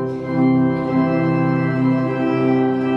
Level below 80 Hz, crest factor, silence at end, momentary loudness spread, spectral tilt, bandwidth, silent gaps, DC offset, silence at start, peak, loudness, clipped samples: -52 dBFS; 12 dB; 0 s; 3 LU; -10 dB/octave; 5.6 kHz; none; under 0.1%; 0 s; -4 dBFS; -18 LUFS; under 0.1%